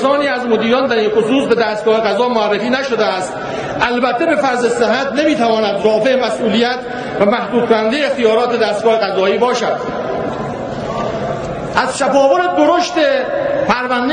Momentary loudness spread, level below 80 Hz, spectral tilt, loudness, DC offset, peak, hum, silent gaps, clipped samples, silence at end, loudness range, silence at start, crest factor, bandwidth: 8 LU; -46 dBFS; -4.5 dB/octave; -15 LUFS; under 0.1%; 0 dBFS; none; none; under 0.1%; 0 s; 2 LU; 0 s; 14 dB; 10 kHz